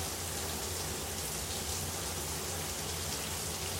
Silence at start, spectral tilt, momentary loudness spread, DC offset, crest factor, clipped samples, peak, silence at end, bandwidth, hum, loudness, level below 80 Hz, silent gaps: 0 s; -2.5 dB/octave; 1 LU; under 0.1%; 14 dB; under 0.1%; -24 dBFS; 0 s; 17 kHz; none; -35 LUFS; -52 dBFS; none